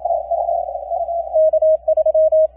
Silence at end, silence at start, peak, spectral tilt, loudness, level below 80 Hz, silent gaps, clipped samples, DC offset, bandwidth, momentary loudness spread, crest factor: 0.1 s; 0 s; -8 dBFS; -9.5 dB/octave; -17 LUFS; -48 dBFS; none; under 0.1%; under 0.1%; 1 kHz; 9 LU; 8 dB